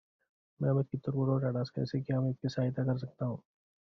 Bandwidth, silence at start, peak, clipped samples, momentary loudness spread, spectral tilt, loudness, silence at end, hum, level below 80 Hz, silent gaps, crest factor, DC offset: 6.2 kHz; 0.6 s; -18 dBFS; under 0.1%; 7 LU; -8.5 dB/octave; -34 LUFS; 0.55 s; none; -66 dBFS; none; 16 dB; under 0.1%